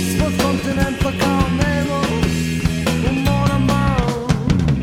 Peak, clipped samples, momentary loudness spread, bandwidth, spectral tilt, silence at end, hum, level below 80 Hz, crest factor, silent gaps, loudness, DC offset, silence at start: -2 dBFS; under 0.1%; 3 LU; 17 kHz; -6 dB/octave; 0 s; none; -28 dBFS; 14 dB; none; -18 LUFS; under 0.1%; 0 s